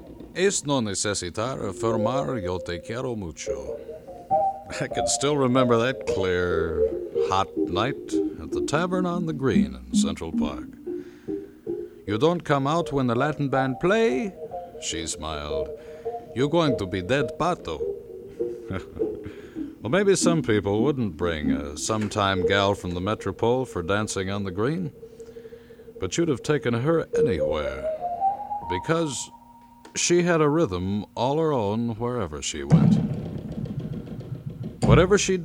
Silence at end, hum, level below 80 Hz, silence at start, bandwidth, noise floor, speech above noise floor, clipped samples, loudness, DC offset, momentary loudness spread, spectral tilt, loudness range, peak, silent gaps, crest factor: 0 s; none; -46 dBFS; 0 s; 15.5 kHz; -50 dBFS; 26 dB; under 0.1%; -25 LUFS; under 0.1%; 14 LU; -5 dB/octave; 4 LU; -4 dBFS; none; 20 dB